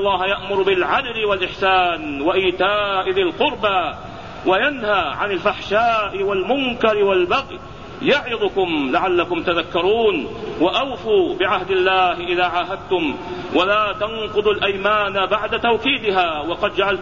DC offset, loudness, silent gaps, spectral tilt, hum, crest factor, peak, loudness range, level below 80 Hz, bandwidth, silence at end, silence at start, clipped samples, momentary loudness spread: 0.5%; -18 LUFS; none; -5.5 dB/octave; none; 16 dB; -4 dBFS; 1 LU; -46 dBFS; 7.4 kHz; 0 s; 0 s; under 0.1%; 5 LU